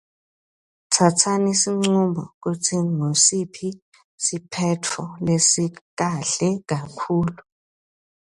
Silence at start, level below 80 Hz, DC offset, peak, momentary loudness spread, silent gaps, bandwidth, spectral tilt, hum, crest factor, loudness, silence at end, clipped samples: 0.9 s; -58 dBFS; under 0.1%; -2 dBFS; 12 LU; 2.34-2.41 s, 3.82-3.92 s, 4.04-4.18 s, 5.81-5.97 s; 11.5 kHz; -4 dB/octave; none; 20 dB; -21 LUFS; 1 s; under 0.1%